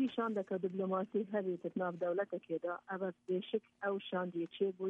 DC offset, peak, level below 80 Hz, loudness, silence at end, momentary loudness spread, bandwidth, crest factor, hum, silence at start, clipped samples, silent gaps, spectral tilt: under 0.1%; -24 dBFS; -88 dBFS; -39 LUFS; 0 s; 4 LU; 4.2 kHz; 14 dB; none; 0 s; under 0.1%; none; -8.5 dB/octave